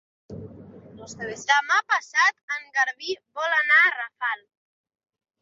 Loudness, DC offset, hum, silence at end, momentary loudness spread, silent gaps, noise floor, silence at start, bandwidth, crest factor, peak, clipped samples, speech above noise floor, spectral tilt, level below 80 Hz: -22 LUFS; under 0.1%; none; 1.05 s; 19 LU; 2.43-2.48 s; -45 dBFS; 0.3 s; 7.8 kHz; 20 dB; -6 dBFS; under 0.1%; 21 dB; -1.5 dB/octave; -66 dBFS